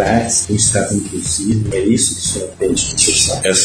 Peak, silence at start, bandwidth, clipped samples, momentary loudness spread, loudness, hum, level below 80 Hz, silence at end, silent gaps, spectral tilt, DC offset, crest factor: 0 dBFS; 0 s; 11 kHz; under 0.1%; 7 LU; -14 LUFS; none; -36 dBFS; 0 s; none; -3 dB/octave; under 0.1%; 16 dB